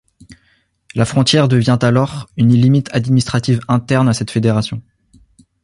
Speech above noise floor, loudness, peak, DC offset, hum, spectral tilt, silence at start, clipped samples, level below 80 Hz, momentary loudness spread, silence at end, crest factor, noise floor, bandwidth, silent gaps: 45 dB; -14 LUFS; -2 dBFS; under 0.1%; none; -6.5 dB/octave; 0.3 s; under 0.1%; -46 dBFS; 7 LU; 0.85 s; 14 dB; -59 dBFS; 11.5 kHz; none